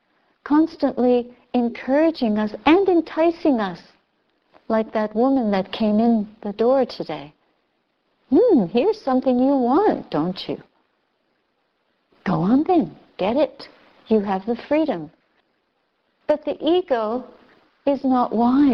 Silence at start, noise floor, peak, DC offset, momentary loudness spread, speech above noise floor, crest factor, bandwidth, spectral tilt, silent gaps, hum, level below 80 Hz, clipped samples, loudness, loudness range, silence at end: 0.45 s; -69 dBFS; -4 dBFS; under 0.1%; 12 LU; 50 dB; 18 dB; 6.2 kHz; -8.5 dB/octave; none; none; -56 dBFS; under 0.1%; -20 LUFS; 5 LU; 0 s